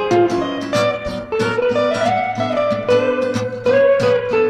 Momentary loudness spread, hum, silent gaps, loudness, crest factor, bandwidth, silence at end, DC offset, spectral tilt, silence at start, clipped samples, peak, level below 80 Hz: 7 LU; none; none; -17 LUFS; 14 dB; 12 kHz; 0 s; under 0.1%; -5.5 dB/octave; 0 s; under 0.1%; -2 dBFS; -46 dBFS